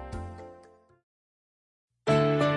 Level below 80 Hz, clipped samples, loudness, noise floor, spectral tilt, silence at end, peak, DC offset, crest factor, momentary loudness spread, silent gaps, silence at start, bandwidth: -52 dBFS; under 0.1%; -27 LUFS; -56 dBFS; -7 dB/octave; 0 s; -12 dBFS; under 0.1%; 18 dB; 23 LU; 1.03-1.88 s; 0 s; 11 kHz